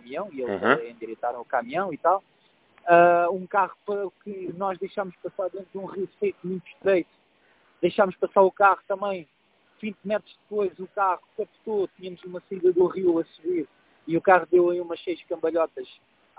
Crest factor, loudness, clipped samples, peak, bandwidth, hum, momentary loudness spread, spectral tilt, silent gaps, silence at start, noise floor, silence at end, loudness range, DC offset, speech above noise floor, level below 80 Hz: 22 dB; -25 LUFS; under 0.1%; -2 dBFS; 4 kHz; none; 16 LU; -10 dB/octave; none; 0.05 s; -62 dBFS; 0.55 s; 6 LU; under 0.1%; 38 dB; -70 dBFS